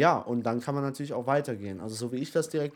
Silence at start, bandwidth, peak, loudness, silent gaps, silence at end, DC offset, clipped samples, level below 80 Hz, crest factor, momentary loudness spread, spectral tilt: 0 s; 18.5 kHz; -8 dBFS; -30 LUFS; none; 0 s; under 0.1%; under 0.1%; -76 dBFS; 20 dB; 7 LU; -6 dB/octave